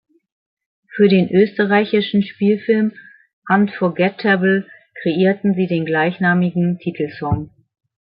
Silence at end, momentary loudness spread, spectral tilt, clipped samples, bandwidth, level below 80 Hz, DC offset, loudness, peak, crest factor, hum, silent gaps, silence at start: 0.55 s; 9 LU; -12 dB/octave; under 0.1%; 5.2 kHz; -52 dBFS; under 0.1%; -17 LUFS; -2 dBFS; 16 dB; none; 3.33-3.42 s; 0.95 s